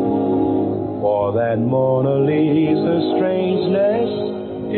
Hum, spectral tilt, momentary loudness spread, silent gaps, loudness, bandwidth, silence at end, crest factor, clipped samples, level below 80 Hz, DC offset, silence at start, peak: none; -13 dB/octave; 5 LU; none; -18 LUFS; 4.4 kHz; 0 s; 10 dB; under 0.1%; -52 dBFS; under 0.1%; 0 s; -8 dBFS